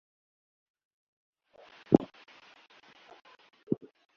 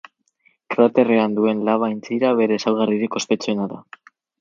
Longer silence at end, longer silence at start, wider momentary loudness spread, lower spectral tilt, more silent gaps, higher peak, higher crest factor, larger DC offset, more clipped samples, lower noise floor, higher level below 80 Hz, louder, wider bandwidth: second, 0.45 s vs 0.6 s; first, 1.9 s vs 0.7 s; first, 28 LU vs 9 LU; first, -8 dB/octave vs -5.5 dB/octave; first, 3.63-3.67 s vs none; about the same, -4 dBFS vs -2 dBFS; first, 32 dB vs 18 dB; neither; neither; second, -58 dBFS vs -62 dBFS; about the same, -66 dBFS vs -68 dBFS; second, -30 LUFS vs -19 LUFS; second, 6.8 kHz vs 7.6 kHz